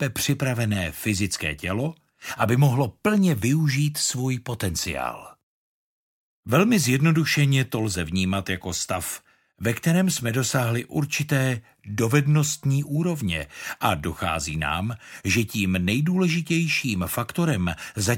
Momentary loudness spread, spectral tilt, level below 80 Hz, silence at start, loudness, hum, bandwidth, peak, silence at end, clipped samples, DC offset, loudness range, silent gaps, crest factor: 9 LU; -5 dB/octave; -48 dBFS; 0 s; -24 LUFS; none; 17 kHz; -4 dBFS; 0 s; under 0.1%; under 0.1%; 2 LU; 5.43-6.43 s; 20 dB